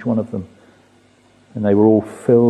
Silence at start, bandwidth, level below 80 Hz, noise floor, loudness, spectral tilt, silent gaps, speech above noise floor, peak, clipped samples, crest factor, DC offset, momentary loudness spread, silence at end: 0 s; 11 kHz; -58 dBFS; -52 dBFS; -17 LUFS; -9.5 dB/octave; none; 37 dB; -2 dBFS; under 0.1%; 16 dB; under 0.1%; 16 LU; 0 s